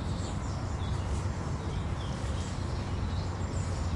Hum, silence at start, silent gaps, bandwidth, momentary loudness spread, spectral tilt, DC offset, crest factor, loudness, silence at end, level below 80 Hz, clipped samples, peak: none; 0 s; none; 11.5 kHz; 2 LU; -6 dB/octave; under 0.1%; 12 dB; -34 LUFS; 0 s; -38 dBFS; under 0.1%; -20 dBFS